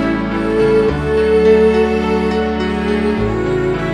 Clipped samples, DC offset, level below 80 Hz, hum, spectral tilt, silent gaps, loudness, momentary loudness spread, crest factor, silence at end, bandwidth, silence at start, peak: under 0.1%; under 0.1%; -30 dBFS; none; -7.5 dB/octave; none; -14 LUFS; 6 LU; 14 dB; 0 s; 10 kHz; 0 s; 0 dBFS